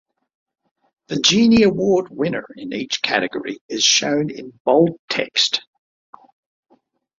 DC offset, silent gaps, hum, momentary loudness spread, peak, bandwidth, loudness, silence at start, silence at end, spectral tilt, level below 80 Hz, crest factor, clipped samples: under 0.1%; 3.61-3.69 s, 4.60-4.65 s, 4.99-5.08 s; none; 14 LU; -2 dBFS; 7.8 kHz; -18 LUFS; 1.1 s; 1.6 s; -3 dB/octave; -54 dBFS; 18 dB; under 0.1%